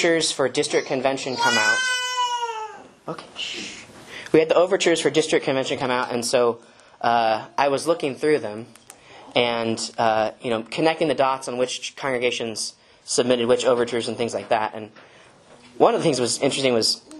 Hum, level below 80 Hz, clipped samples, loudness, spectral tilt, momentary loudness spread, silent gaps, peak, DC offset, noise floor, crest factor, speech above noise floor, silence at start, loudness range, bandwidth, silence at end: none; -66 dBFS; under 0.1%; -22 LUFS; -3 dB/octave; 14 LU; none; -2 dBFS; under 0.1%; -50 dBFS; 22 dB; 28 dB; 0 s; 2 LU; 12.5 kHz; 0 s